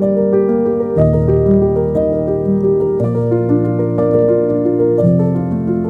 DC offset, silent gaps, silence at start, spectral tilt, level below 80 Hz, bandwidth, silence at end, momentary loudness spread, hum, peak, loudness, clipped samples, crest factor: under 0.1%; none; 0 s; -12 dB/octave; -32 dBFS; 3.3 kHz; 0 s; 4 LU; none; 0 dBFS; -14 LUFS; under 0.1%; 14 dB